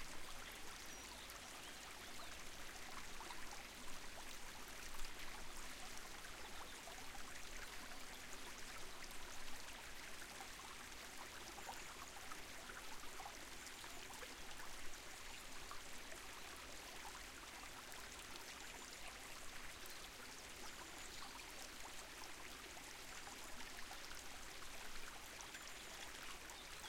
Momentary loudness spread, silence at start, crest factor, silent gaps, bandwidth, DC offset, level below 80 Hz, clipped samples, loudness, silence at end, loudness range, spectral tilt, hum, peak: 1 LU; 0 s; 18 dB; none; 16.5 kHz; under 0.1%; -60 dBFS; under 0.1%; -53 LUFS; 0 s; 0 LU; -1.5 dB/octave; none; -34 dBFS